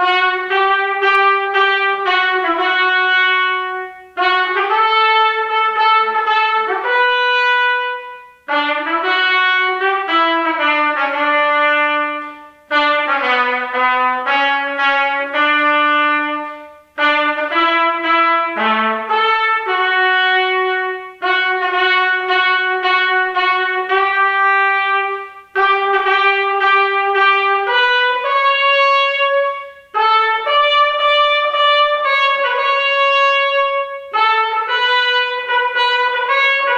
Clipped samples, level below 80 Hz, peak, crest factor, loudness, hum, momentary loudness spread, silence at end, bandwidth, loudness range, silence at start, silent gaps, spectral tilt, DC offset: under 0.1%; -62 dBFS; -2 dBFS; 12 dB; -14 LUFS; 60 Hz at -70 dBFS; 5 LU; 0 s; 8 kHz; 2 LU; 0 s; none; -2 dB/octave; under 0.1%